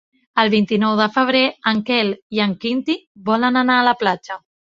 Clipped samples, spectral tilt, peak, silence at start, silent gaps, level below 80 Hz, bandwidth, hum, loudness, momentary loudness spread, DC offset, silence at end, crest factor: under 0.1%; -6 dB/octave; 0 dBFS; 0.35 s; 2.22-2.30 s, 3.07-3.15 s; -62 dBFS; 7.4 kHz; none; -18 LUFS; 9 LU; under 0.1%; 0.35 s; 18 dB